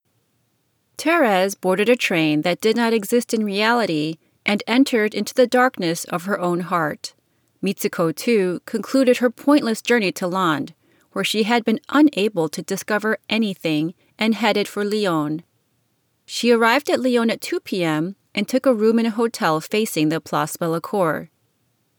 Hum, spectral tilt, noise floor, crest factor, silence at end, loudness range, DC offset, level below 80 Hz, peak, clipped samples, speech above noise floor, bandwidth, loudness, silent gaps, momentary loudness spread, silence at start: none; -4.5 dB/octave; -67 dBFS; 16 dB; 0.7 s; 2 LU; under 0.1%; -78 dBFS; -4 dBFS; under 0.1%; 48 dB; over 20 kHz; -20 LUFS; none; 9 LU; 1 s